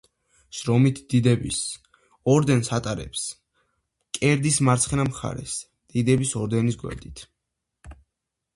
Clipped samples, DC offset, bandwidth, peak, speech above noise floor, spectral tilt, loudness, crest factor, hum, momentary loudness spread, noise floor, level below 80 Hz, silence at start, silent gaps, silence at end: under 0.1%; under 0.1%; 11.5 kHz; -6 dBFS; 60 dB; -5 dB/octave; -23 LUFS; 18 dB; none; 14 LU; -83 dBFS; -48 dBFS; 0.55 s; none; 0.6 s